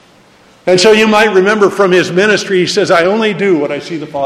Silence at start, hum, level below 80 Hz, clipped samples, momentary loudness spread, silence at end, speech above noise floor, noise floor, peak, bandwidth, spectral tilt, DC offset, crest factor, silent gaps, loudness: 0.65 s; none; -52 dBFS; 0.2%; 9 LU; 0 s; 34 dB; -44 dBFS; 0 dBFS; 13.5 kHz; -4.5 dB/octave; under 0.1%; 10 dB; none; -10 LUFS